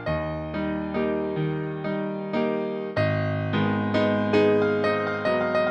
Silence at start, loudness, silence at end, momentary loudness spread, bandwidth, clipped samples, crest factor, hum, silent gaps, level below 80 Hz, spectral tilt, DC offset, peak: 0 s; -25 LUFS; 0 s; 8 LU; 8.6 kHz; under 0.1%; 16 dB; none; none; -50 dBFS; -8 dB/octave; under 0.1%; -10 dBFS